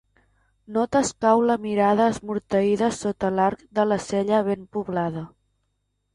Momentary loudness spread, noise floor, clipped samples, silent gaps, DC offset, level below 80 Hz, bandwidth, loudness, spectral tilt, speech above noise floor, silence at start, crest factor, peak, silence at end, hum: 9 LU; -74 dBFS; under 0.1%; none; under 0.1%; -56 dBFS; 11.5 kHz; -23 LUFS; -5.5 dB/octave; 52 dB; 0.7 s; 18 dB; -6 dBFS; 0.9 s; 50 Hz at -60 dBFS